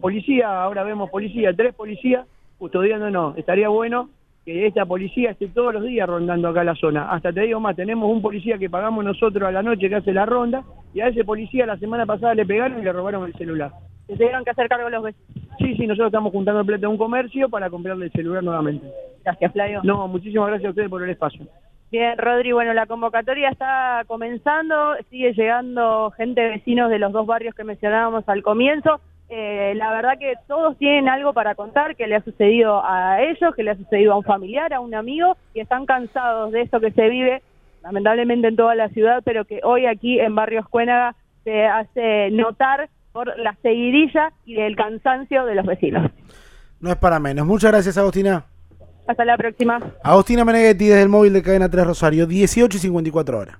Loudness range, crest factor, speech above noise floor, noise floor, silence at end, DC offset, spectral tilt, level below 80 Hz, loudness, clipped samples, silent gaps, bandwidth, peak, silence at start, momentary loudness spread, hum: 6 LU; 18 dB; 26 dB; -45 dBFS; 0.05 s; under 0.1%; -6 dB/octave; -42 dBFS; -19 LUFS; under 0.1%; none; 14 kHz; 0 dBFS; 0 s; 10 LU; none